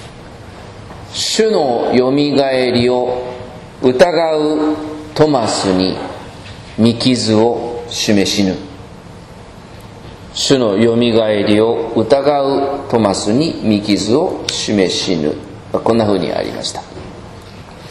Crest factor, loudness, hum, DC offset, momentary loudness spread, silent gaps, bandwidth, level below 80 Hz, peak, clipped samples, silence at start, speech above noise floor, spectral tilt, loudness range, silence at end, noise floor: 16 dB; -14 LUFS; none; under 0.1%; 22 LU; none; 12.5 kHz; -44 dBFS; 0 dBFS; under 0.1%; 0 s; 21 dB; -5 dB/octave; 3 LU; 0 s; -35 dBFS